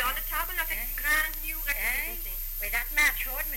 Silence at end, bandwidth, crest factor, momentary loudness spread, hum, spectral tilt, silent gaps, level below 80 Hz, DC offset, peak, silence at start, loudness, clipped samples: 0 s; 17 kHz; 16 dB; 8 LU; none; -0.5 dB/octave; none; -38 dBFS; under 0.1%; -14 dBFS; 0 s; -28 LUFS; under 0.1%